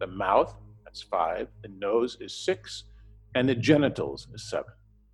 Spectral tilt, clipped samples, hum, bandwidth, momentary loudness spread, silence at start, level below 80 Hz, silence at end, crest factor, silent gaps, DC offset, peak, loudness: -6 dB/octave; under 0.1%; none; 11.5 kHz; 18 LU; 0 s; -54 dBFS; 0.4 s; 22 dB; none; under 0.1%; -8 dBFS; -28 LUFS